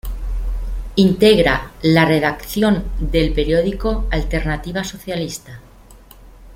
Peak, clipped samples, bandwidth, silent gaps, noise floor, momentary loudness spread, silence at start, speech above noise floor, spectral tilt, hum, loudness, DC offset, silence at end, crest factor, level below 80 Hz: -2 dBFS; under 0.1%; 16.5 kHz; none; -43 dBFS; 14 LU; 0.05 s; 26 dB; -6 dB/octave; none; -18 LUFS; under 0.1%; 0 s; 16 dB; -26 dBFS